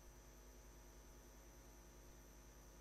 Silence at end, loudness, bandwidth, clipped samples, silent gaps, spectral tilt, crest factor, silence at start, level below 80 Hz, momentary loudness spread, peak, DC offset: 0 s; -63 LUFS; 13 kHz; under 0.1%; none; -4 dB/octave; 12 dB; 0 s; -64 dBFS; 0 LU; -48 dBFS; under 0.1%